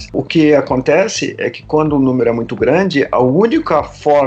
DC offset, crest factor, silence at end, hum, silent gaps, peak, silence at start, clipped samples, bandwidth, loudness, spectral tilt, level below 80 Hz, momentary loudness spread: under 0.1%; 12 dB; 0 s; none; none; 0 dBFS; 0 s; under 0.1%; 8.4 kHz; -13 LUFS; -6 dB/octave; -42 dBFS; 5 LU